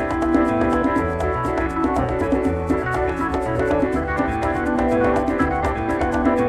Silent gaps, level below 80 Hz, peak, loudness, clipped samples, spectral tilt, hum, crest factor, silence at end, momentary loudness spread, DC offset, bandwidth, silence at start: none; -32 dBFS; -6 dBFS; -21 LUFS; under 0.1%; -7.5 dB/octave; none; 14 dB; 0 s; 3 LU; under 0.1%; 12.5 kHz; 0 s